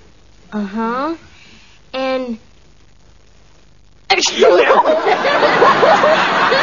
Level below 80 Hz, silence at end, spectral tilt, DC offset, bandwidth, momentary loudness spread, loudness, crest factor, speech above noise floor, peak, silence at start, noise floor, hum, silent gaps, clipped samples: -50 dBFS; 0 s; -3 dB/octave; 0.5%; 7.4 kHz; 17 LU; -13 LUFS; 16 dB; 36 dB; 0 dBFS; 0.5 s; -49 dBFS; none; none; under 0.1%